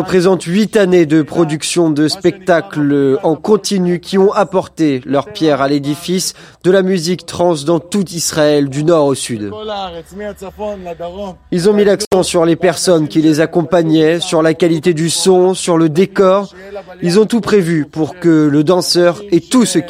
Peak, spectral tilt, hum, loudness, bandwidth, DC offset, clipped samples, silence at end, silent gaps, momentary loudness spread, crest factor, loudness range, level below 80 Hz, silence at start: 0 dBFS; -5 dB/octave; none; -13 LUFS; 16 kHz; under 0.1%; under 0.1%; 0 s; 12.07-12.11 s; 12 LU; 12 dB; 4 LU; -48 dBFS; 0 s